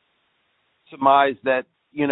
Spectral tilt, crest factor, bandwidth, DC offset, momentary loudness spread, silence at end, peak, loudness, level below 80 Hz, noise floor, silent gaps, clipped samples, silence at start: -9.5 dB/octave; 20 dB; 4.1 kHz; under 0.1%; 9 LU; 0 s; -2 dBFS; -20 LUFS; -68 dBFS; -68 dBFS; none; under 0.1%; 0.95 s